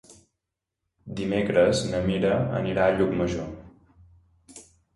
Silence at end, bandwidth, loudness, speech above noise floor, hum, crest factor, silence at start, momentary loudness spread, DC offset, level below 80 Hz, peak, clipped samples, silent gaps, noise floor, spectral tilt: 0.35 s; 11.5 kHz; -24 LUFS; 61 dB; none; 18 dB; 0.1 s; 14 LU; under 0.1%; -48 dBFS; -8 dBFS; under 0.1%; none; -84 dBFS; -6 dB/octave